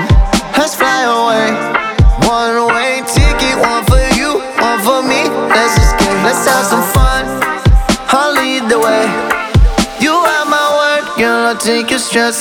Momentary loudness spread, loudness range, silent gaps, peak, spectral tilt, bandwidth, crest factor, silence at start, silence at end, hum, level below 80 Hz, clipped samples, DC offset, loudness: 3 LU; 1 LU; none; 0 dBFS; -4 dB/octave; 18.5 kHz; 10 dB; 0 s; 0 s; none; -18 dBFS; under 0.1%; under 0.1%; -11 LUFS